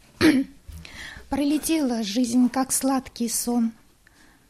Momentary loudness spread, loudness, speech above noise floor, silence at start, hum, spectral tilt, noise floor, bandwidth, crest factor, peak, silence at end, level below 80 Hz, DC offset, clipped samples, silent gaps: 18 LU; -23 LUFS; 32 dB; 0.2 s; none; -3.5 dB/octave; -55 dBFS; 15.5 kHz; 18 dB; -6 dBFS; 0.8 s; -50 dBFS; under 0.1%; under 0.1%; none